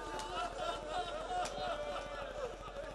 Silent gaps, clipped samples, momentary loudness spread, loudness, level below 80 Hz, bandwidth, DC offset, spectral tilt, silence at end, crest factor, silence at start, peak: none; under 0.1%; 5 LU; -41 LUFS; -54 dBFS; 12 kHz; under 0.1%; -3 dB/octave; 0 s; 14 dB; 0 s; -26 dBFS